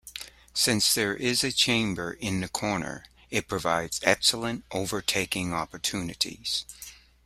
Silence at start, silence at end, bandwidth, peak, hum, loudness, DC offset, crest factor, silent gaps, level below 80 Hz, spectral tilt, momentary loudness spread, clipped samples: 0.05 s; 0.3 s; 16 kHz; -4 dBFS; none; -26 LUFS; under 0.1%; 26 dB; none; -56 dBFS; -2.5 dB/octave; 12 LU; under 0.1%